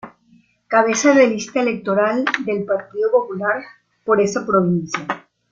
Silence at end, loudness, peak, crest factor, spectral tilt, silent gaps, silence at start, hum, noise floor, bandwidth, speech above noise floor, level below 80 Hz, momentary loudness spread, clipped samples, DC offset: 0.3 s; -18 LUFS; -2 dBFS; 16 dB; -5 dB/octave; none; 0.05 s; none; -55 dBFS; 8.4 kHz; 38 dB; -62 dBFS; 11 LU; under 0.1%; under 0.1%